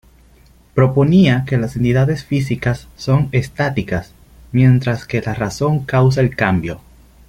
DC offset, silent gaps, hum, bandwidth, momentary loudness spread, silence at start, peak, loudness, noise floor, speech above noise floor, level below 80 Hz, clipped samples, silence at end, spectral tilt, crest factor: under 0.1%; none; none; 10.5 kHz; 10 LU; 0.75 s; -2 dBFS; -16 LUFS; -48 dBFS; 33 dB; -40 dBFS; under 0.1%; 0.5 s; -7.5 dB/octave; 16 dB